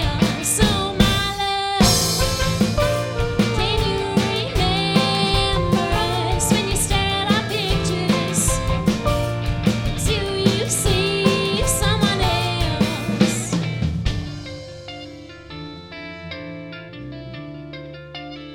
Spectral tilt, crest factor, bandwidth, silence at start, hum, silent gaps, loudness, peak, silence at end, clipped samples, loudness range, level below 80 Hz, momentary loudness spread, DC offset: -4 dB/octave; 20 dB; 19.5 kHz; 0 s; none; none; -19 LUFS; 0 dBFS; 0 s; under 0.1%; 13 LU; -30 dBFS; 17 LU; under 0.1%